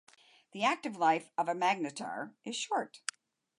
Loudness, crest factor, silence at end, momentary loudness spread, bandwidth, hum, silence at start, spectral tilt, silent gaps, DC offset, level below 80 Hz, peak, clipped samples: -34 LUFS; 18 dB; 0.6 s; 12 LU; 11.5 kHz; none; 0.55 s; -3 dB/octave; none; under 0.1%; under -90 dBFS; -16 dBFS; under 0.1%